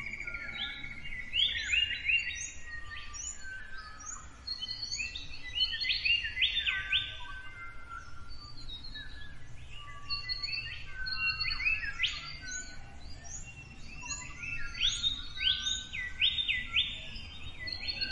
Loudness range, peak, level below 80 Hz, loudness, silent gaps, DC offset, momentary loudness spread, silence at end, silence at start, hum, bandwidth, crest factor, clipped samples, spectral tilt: 8 LU; -16 dBFS; -48 dBFS; -32 LUFS; none; under 0.1%; 19 LU; 0 s; 0 s; none; 11 kHz; 20 dB; under 0.1%; 0 dB/octave